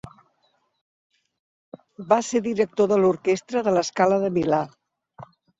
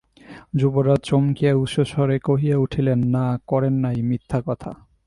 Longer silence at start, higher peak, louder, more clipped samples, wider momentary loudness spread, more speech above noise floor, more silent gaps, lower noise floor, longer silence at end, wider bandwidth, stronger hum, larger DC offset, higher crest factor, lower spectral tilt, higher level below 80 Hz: second, 0.05 s vs 0.3 s; about the same, -6 dBFS vs -6 dBFS; about the same, -22 LUFS vs -21 LUFS; neither; about the same, 5 LU vs 7 LU; first, 47 dB vs 25 dB; first, 0.81-1.10 s, 1.39-1.72 s vs none; first, -68 dBFS vs -44 dBFS; about the same, 0.35 s vs 0.3 s; second, 7.8 kHz vs 11 kHz; neither; neither; about the same, 18 dB vs 14 dB; second, -5.5 dB/octave vs -8.5 dB/octave; second, -64 dBFS vs -48 dBFS